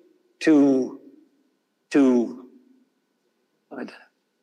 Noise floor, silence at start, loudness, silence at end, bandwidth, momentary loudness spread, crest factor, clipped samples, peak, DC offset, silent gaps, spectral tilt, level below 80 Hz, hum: -71 dBFS; 0.4 s; -21 LUFS; 0.55 s; 9.6 kHz; 22 LU; 16 dB; under 0.1%; -8 dBFS; under 0.1%; none; -6 dB/octave; -80 dBFS; none